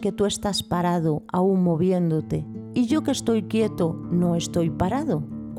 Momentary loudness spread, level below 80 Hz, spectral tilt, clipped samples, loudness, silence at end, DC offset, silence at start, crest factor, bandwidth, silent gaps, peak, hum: 6 LU; -50 dBFS; -6.5 dB/octave; under 0.1%; -24 LUFS; 0 s; under 0.1%; 0 s; 12 dB; 14 kHz; none; -10 dBFS; none